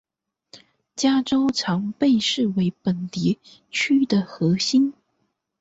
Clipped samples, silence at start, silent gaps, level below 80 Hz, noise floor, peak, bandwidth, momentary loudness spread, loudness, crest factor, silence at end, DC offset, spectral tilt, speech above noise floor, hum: under 0.1%; 0.55 s; none; -62 dBFS; -73 dBFS; -8 dBFS; 8 kHz; 7 LU; -22 LUFS; 14 dB; 0.7 s; under 0.1%; -5 dB/octave; 52 dB; none